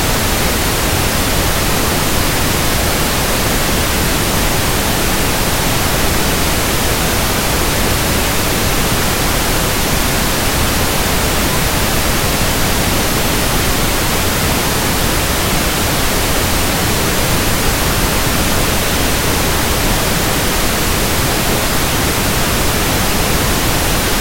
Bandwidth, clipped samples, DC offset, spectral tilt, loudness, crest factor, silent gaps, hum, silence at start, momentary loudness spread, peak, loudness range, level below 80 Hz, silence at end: 16.5 kHz; under 0.1%; under 0.1%; -3 dB/octave; -14 LUFS; 14 dB; none; none; 0 s; 0 LU; 0 dBFS; 0 LU; -22 dBFS; 0 s